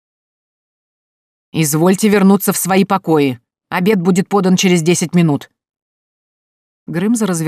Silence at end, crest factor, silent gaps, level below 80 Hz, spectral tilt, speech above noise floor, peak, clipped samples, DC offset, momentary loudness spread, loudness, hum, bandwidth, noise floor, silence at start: 0 s; 14 dB; 5.82-6.86 s; -62 dBFS; -5.5 dB/octave; over 77 dB; -2 dBFS; under 0.1%; under 0.1%; 9 LU; -14 LUFS; none; 16 kHz; under -90 dBFS; 1.55 s